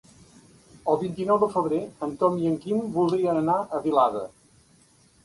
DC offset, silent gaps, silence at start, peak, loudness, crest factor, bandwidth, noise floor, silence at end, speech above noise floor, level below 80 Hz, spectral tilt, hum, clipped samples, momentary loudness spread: under 0.1%; none; 0.85 s; -8 dBFS; -25 LUFS; 18 dB; 11.5 kHz; -59 dBFS; 0.95 s; 35 dB; -62 dBFS; -8 dB/octave; none; under 0.1%; 8 LU